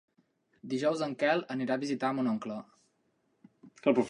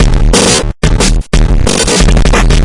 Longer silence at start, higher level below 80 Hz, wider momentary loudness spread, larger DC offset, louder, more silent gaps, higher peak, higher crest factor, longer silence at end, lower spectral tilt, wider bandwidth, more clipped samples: first, 0.65 s vs 0 s; second, -80 dBFS vs -10 dBFS; first, 11 LU vs 4 LU; neither; second, -32 LUFS vs -9 LUFS; neither; second, -12 dBFS vs 0 dBFS; first, 22 dB vs 6 dB; about the same, 0 s vs 0 s; first, -6 dB/octave vs -4 dB/octave; about the same, 11 kHz vs 11.5 kHz; second, under 0.1% vs 0.2%